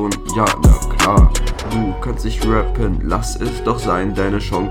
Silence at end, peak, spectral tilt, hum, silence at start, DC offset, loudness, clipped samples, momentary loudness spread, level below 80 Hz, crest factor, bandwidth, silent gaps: 0 s; -2 dBFS; -5.5 dB/octave; none; 0 s; under 0.1%; -17 LUFS; under 0.1%; 9 LU; -18 dBFS; 14 dB; 16.5 kHz; none